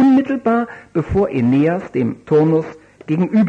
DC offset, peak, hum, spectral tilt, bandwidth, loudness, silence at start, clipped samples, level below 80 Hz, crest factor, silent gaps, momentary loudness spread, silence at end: under 0.1%; -6 dBFS; none; -9.5 dB/octave; 7.4 kHz; -17 LUFS; 0 s; under 0.1%; -42 dBFS; 10 dB; none; 9 LU; 0 s